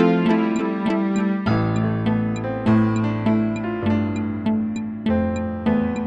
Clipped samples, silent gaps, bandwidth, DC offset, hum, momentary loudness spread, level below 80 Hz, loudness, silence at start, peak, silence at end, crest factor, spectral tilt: under 0.1%; none; 7.8 kHz; under 0.1%; none; 5 LU; -44 dBFS; -21 LUFS; 0 s; -4 dBFS; 0 s; 16 dB; -8 dB/octave